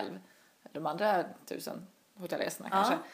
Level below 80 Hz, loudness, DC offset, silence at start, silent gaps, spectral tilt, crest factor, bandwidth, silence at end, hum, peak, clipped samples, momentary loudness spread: -84 dBFS; -34 LUFS; under 0.1%; 0 s; none; -4 dB/octave; 20 dB; 15.5 kHz; 0 s; none; -16 dBFS; under 0.1%; 18 LU